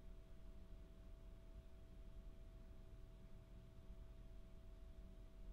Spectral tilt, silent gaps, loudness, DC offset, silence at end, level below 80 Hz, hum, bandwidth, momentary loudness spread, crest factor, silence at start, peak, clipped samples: -7 dB/octave; none; -64 LUFS; under 0.1%; 0 s; -60 dBFS; none; 15.5 kHz; 2 LU; 12 dB; 0 s; -46 dBFS; under 0.1%